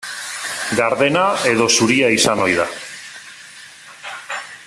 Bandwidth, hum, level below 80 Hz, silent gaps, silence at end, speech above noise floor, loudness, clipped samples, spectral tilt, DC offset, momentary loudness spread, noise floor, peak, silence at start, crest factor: 14 kHz; none; -56 dBFS; none; 0 s; 24 dB; -16 LUFS; under 0.1%; -3 dB/octave; under 0.1%; 23 LU; -40 dBFS; -2 dBFS; 0 s; 16 dB